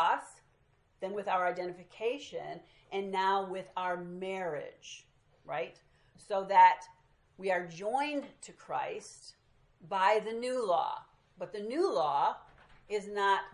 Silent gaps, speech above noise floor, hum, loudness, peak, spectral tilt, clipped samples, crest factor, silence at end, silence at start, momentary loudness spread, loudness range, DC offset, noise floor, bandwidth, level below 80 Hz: none; 37 dB; none; -33 LUFS; -12 dBFS; -4 dB/octave; under 0.1%; 22 dB; 0 s; 0 s; 18 LU; 6 LU; under 0.1%; -69 dBFS; 11.5 kHz; -74 dBFS